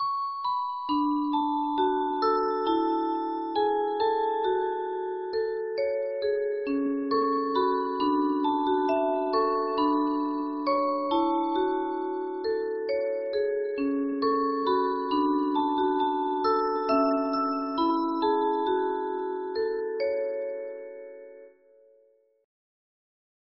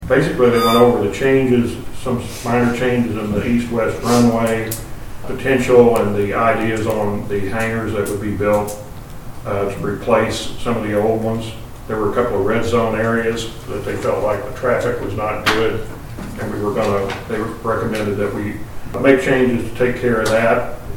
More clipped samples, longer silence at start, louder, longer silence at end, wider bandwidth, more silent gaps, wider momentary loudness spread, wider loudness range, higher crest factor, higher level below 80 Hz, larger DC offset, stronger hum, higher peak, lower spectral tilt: neither; about the same, 0 s vs 0 s; second, -27 LUFS vs -18 LUFS; first, 1.95 s vs 0 s; second, 5.8 kHz vs 19 kHz; neither; second, 5 LU vs 13 LU; about the same, 4 LU vs 5 LU; about the same, 14 dB vs 18 dB; second, -66 dBFS vs -36 dBFS; second, under 0.1% vs 0.5%; neither; second, -14 dBFS vs 0 dBFS; second, -2 dB/octave vs -6 dB/octave